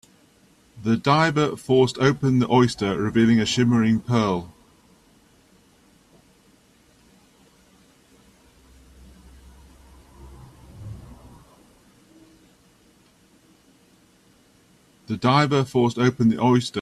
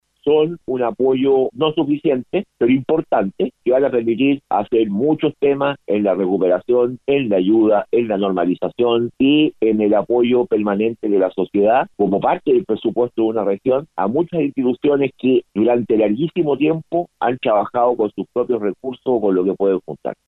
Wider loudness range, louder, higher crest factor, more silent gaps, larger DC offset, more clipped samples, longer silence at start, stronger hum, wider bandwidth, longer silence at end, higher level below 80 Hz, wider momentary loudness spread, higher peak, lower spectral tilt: first, 10 LU vs 2 LU; about the same, -20 LUFS vs -18 LUFS; first, 20 dB vs 12 dB; neither; neither; neither; first, 0.75 s vs 0.25 s; neither; first, 12.5 kHz vs 4.1 kHz; second, 0 s vs 0.15 s; about the same, -54 dBFS vs -58 dBFS; first, 14 LU vs 5 LU; about the same, -4 dBFS vs -4 dBFS; second, -6 dB/octave vs -9.5 dB/octave